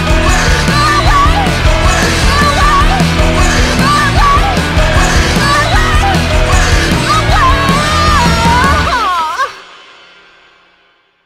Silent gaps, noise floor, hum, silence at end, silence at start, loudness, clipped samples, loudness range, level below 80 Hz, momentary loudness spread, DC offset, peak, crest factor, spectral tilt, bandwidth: none; -51 dBFS; none; 1.6 s; 0 s; -9 LUFS; under 0.1%; 2 LU; -14 dBFS; 3 LU; under 0.1%; 0 dBFS; 10 dB; -4 dB/octave; 16 kHz